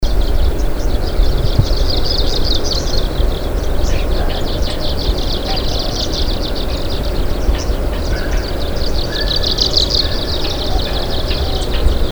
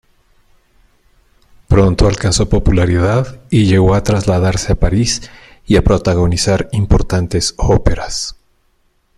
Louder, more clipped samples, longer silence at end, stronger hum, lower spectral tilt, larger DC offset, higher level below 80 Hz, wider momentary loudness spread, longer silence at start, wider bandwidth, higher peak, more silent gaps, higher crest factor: second, -18 LUFS vs -14 LUFS; neither; second, 0 s vs 0.85 s; neither; about the same, -4.5 dB/octave vs -5.5 dB/octave; first, 0.4% vs under 0.1%; first, -16 dBFS vs -22 dBFS; about the same, 5 LU vs 6 LU; second, 0 s vs 1.7 s; first, over 20 kHz vs 12 kHz; about the same, 0 dBFS vs 0 dBFS; neither; about the same, 14 dB vs 14 dB